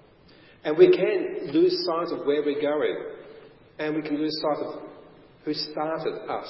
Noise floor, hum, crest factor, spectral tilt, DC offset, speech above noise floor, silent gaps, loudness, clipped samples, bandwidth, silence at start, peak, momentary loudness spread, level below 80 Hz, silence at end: -53 dBFS; none; 22 dB; -9 dB/octave; under 0.1%; 29 dB; none; -25 LUFS; under 0.1%; 5.8 kHz; 0.65 s; -4 dBFS; 17 LU; -70 dBFS; 0 s